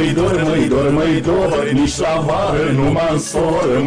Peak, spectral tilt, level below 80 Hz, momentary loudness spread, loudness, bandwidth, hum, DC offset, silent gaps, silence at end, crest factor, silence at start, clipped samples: -6 dBFS; -6 dB/octave; -32 dBFS; 2 LU; -16 LUFS; 11 kHz; none; under 0.1%; none; 0 s; 10 dB; 0 s; under 0.1%